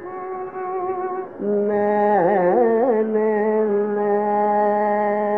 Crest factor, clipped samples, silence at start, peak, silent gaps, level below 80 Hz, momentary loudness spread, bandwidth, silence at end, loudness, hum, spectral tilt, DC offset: 14 dB; under 0.1%; 0 s; -6 dBFS; none; -72 dBFS; 10 LU; 3.9 kHz; 0 s; -20 LUFS; none; -10.5 dB/octave; 0.2%